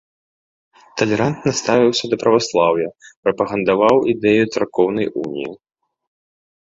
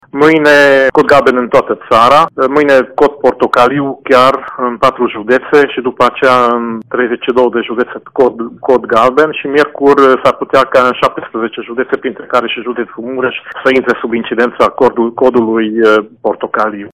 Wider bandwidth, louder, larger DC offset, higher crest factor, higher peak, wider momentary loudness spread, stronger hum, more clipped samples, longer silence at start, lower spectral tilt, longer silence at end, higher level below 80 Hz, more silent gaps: second, 7.8 kHz vs 15.5 kHz; second, -17 LUFS vs -10 LUFS; neither; first, 16 dB vs 10 dB; about the same, -2 dBFS vs 0 dBFS; about the same, 10 LU vs 10 LU; neither; second, under 0.1% vs 1%; first, 0.95 s vs 0.15 s; about the same, -5 dB/octave vs -5.5 dB/octave; first, 1.1 s vs 0.05 s; second, -56 dBFS vs -46 dBFS; first, 3.16-3.23 s vs none